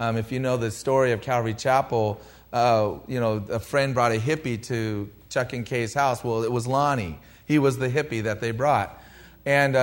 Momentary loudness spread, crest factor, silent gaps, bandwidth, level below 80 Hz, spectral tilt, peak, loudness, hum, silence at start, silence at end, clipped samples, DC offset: 7 LU; 18 dB; none; 16 kHz; -54 dBFS; -6 dB/octave; -8 dBFS; -25 LUFS; none; 0 s; 0 s; under 0.1%; under 0.1%